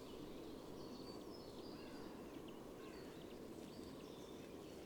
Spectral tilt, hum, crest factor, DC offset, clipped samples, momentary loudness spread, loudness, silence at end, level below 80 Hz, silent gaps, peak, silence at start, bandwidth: -5 dB/octave; none; 14 dB; under 0.1%; under 0.1%; 2 LU; -54 LUFS; 0 s; -70 dBFS; none; -40 dBFS; 0 s; 19.5 kHz